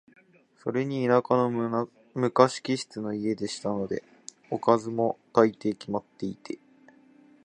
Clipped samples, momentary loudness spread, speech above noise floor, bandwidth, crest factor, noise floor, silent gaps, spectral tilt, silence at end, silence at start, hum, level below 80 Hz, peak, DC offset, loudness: under 0.1%; 14 LU; 30 dB; 10 kHz; 26 dB; -57 dBFS; none; -6 dB/octave; 0.9 s; 0.65 s; none; -68 dBFS; -2 dBFS; under 0.1%; -27 LUFS